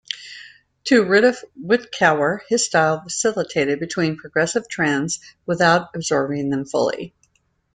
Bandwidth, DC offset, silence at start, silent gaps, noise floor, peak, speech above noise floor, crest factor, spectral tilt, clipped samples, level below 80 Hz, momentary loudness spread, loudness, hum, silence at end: 9.6 kHz; under 0.1%; 0.1 s; none; -66 dBFS; -2 dBFS; 46 dB; 18 dB; -4 dB/octave; under 0.1%; -62 dBFS; 14 LU; -19 LUFS; none; 0.65 s